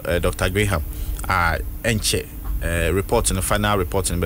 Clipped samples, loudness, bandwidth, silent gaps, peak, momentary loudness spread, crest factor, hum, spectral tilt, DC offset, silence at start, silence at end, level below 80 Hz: under 0.1%; -21 LUFS; 16.5 kHz; none; -6 dBFS; 6 LU; 16 dB; none; -4 dB/octave; under 0.1%; 0 s; 0 s; -28 dBFS